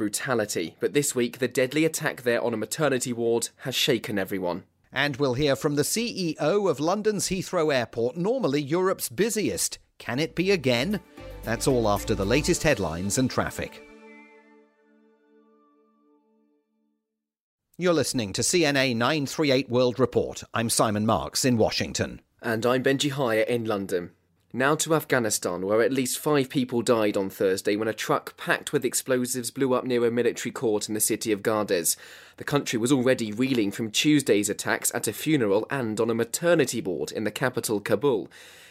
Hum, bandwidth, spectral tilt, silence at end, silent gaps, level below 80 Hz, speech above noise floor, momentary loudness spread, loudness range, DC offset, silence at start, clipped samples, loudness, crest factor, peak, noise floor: none; 16 kHz; -4 dB/octave; 0.05 s; 17.41-17.58 s; -52 dBFS; 58 dB; 7 LU; 2 LU; under 0.1%; 0 s; under 0.1%; -25 LUFS; 20 dB; -6 dBFS; -83 dBFS